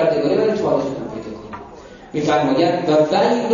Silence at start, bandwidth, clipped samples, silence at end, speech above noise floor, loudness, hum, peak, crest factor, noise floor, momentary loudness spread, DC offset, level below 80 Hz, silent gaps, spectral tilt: 0 s; 7.4 kHz; under 0.1%; 0 s; 23 dB; -18 LUFS; none; -4 dBFS; 14 dB; -39 dBFS; 17 LU; under 0.1%; -52 dBFS; none; -6 dB/octave